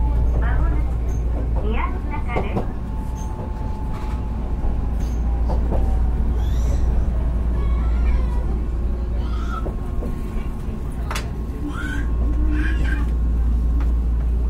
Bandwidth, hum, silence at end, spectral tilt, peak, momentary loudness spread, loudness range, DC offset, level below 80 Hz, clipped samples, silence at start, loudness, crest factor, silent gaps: 7.2 kHz; none; 0 s; -7.5 dB/octave; -6 dBFS; 7 LU; 4 LU; under 0.1%; -20 dBFS; under 0.1%; 0 s; -24 LUFS; 14 dB; none